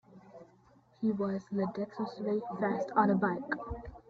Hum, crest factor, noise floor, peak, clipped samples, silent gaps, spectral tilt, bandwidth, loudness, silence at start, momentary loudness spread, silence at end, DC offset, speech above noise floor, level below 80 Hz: none; 20 dB; -64 dBFS; -14 dBFS; under 0.1%; none; -8.5 dB/octave; 6.6 kHz; -33 LUFS; 0.1 s; 10 LU; 0.1 s; under 0.1%; 31 dB; -58 dBFS